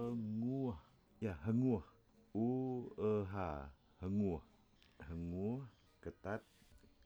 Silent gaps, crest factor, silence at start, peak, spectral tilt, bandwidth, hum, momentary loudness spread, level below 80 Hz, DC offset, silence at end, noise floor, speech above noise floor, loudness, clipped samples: none; 16 dB; 0 s; -26 dBFS; -9.5 dB/octave; over 20 kHz; none; 14 LU; -62 dBFS; under 0.1%; 0.3 s; -67 dBFS; 26 dB; -42 LUFS; under 0.1%